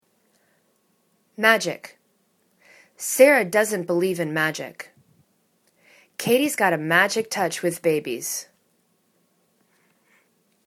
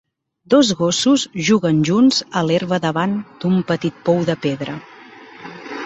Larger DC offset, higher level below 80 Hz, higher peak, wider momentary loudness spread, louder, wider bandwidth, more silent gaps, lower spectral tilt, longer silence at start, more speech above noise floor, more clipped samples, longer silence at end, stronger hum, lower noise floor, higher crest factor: neither; second, -74 dBFS vs -58 dBFS; about the same, 0 dBFS vs -2 dBFS; about the same, 16 LU vs 15 LU; second, -21 LUFS vs -17 LUFS; first, 19 kHz vs 8.4 kHz; neither; second, -3.5 dB/octave vs -5 dB/octave; first, 1.4 s vs 0.5 s; first, 45 dB vs 24 dB; neither; first, 2.25 s vs 0 s; neither; first, -67 dBFS vs -41 dBFS; first, 24 dB vs 16 dB